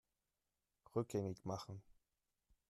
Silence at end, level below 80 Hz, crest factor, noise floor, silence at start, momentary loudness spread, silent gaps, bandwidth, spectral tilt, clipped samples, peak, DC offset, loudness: 0.8 s; -76 dBFS; 22 dB; under -90 dBFS; 0.95 s; 12 LU; none; 13 kHz; -7 dB/octave; under 0.1%; -26 dBFS; under 0.1%; -46 LUFS